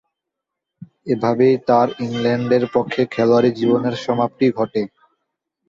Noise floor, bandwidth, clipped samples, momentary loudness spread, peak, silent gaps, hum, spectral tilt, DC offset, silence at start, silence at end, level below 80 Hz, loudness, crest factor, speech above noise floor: -82 dBFS; 7.6 kHz; under 0.1%; 7 LU; -2 dBFS; none; none; -7.5 dB/octave; under 0.1%; 0.8 s; 0.8 s; -60 dBFS; -18 LUFS; 16 dB; 65 dB